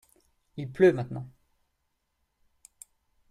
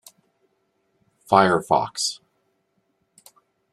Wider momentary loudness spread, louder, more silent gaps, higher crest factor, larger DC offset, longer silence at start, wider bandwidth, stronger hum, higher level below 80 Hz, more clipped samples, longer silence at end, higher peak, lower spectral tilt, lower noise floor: first, 23 LU vs 9 LU; second, -26 LUFS vs -20 LUFS; neither; about the same, 22 dB vs 24 dB; neither; second, 0.55 s vs 1.3 s; second, 12.5 kHz vs 14 kHz; neither; about the same, -66 dBFS vs -64 dBFS; neither; first, 2 s vs 1.6 s; second, -10 dBFS vs -2 dBFS; first, -7.5 dB/octave vs -4 dB/octave; first, -78 dBFS vs -71 dBFS